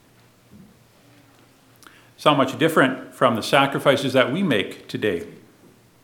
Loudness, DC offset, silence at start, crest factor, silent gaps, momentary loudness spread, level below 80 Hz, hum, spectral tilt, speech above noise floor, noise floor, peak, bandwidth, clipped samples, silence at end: -20 LUFS; under 0.1%; 2.2 s; 22 dB; none; 8 LU; -66 dBFS; none; -5 dB/octave; 35 dB; -55 dBFS; 0 dBFS; 18 kHz; under 0.1%; 0.7 s